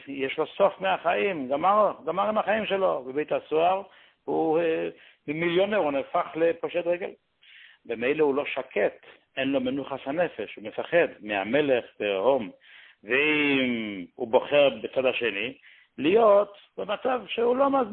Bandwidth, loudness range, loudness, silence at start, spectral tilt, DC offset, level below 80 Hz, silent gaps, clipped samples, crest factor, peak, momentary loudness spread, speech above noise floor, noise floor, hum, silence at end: 4.3 kHz; 4 LU; -26 LUFS; 0 s; -9.5 dB/octave; under 0.1%; -68 dBFS; none; under 0.1%; 18 dB; -6 dBFS; 10 LU; 28 dB; -53 dBFS; none; 0 s